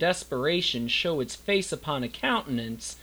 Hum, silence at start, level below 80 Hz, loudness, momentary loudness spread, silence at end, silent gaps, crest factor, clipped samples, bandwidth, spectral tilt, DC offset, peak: none; 0 s; -54 dBFS; -27 LUFS; 7 LU; 0 s; none; 18 dB; under 0.1%; over 20 kHz; -3.5 dB/octave; under 0.1%; -10 dBFS